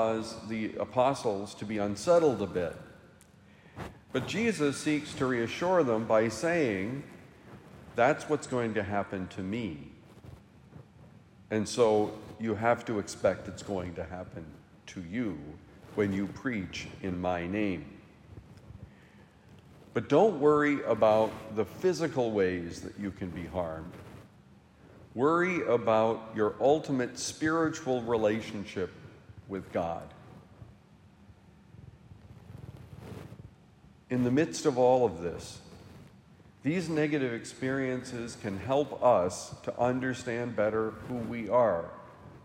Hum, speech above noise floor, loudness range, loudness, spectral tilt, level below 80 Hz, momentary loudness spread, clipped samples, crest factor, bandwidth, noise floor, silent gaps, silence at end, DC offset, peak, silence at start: none; 28 dB; 8 LU; -30 LUFS; -5.5 dB/octave; -64 dBFS; 21 LU; under 0.1%; 20 dB; 16 kHz; -58 dBFS; none; 0.05 s; under 0.1%; -12 dBFS; 0 s